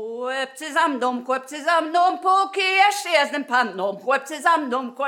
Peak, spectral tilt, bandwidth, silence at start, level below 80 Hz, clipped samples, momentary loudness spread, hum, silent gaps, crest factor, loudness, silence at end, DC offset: -4 dBFS; -2 dB/octave; 18 kHz; 0 s; under -90 dBFS; under 0.1%; 9 LU; none; none; 18 dB; -21 LUFS; 0 s; under 0.1%